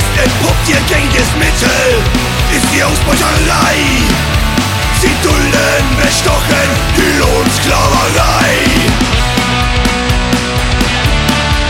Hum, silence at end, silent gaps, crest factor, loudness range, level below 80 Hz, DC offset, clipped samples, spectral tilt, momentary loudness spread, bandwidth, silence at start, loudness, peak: none; 0 s; none; 10 dB; 1 LU; -16 dBFS; under 0.1%; under 0.1%; -4 dB/octave; 3 LU; 16.5 kHz; 0 s; -10 LUFS; 0 dBFS